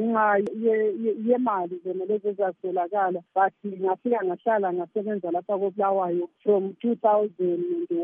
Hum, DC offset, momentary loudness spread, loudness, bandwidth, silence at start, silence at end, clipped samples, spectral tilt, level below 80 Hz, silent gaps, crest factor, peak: none; under 0.1%; 6 LU; -25 LUFS; 3.7 kHz; 0 s; 0 s; under 0.1%; -9.5 dB/octave; -84 dBFS; none; 16 dB; -10 dBFS